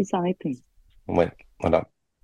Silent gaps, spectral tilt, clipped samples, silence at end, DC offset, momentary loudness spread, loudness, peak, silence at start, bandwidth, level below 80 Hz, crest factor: none; -7 dB/octave; under 0.1%; 0.4 s; under 0.1%; 16 LU; -26 LUFS; -4 dBFS; 0 s; 10 kHz; -50 dBFS; 22 dB